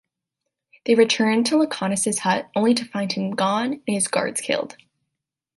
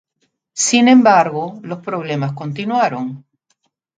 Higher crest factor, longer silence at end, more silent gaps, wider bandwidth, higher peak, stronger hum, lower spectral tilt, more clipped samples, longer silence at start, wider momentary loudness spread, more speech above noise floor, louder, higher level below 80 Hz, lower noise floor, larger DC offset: about the same, 18 dB vs 16 dB; about the same, 0.85 s vs 0.8 s; neither; first, 12 kHz vs 9.4 kHz; second, -4 dBFS vs 0 dBFS; neither; about the same, -3.5 dB/octave vs -4 dB/octave; neither; first, 0.85 s vs 0.55 s; second, 8 LU vs 17 LU; first, 62 dB vs 53 dB; second, -21 LUFS vs -15 LUFS; about the same, -68 dBFS vs -66 dBFS; first, -83 dBFS vs -68 dBFS; neither